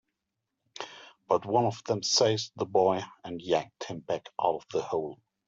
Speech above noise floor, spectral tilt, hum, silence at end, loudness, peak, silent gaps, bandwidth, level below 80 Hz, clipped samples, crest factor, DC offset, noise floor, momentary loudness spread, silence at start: 56 dB; -4 dB/octave; none; 0.35 s; -29 LUFS; -10 dBFS; none; 8 kHz; -72 dBFS; under 0.1%; 20 dB; under 0.1%; -85 dBFS; 16 LU; 0.75 s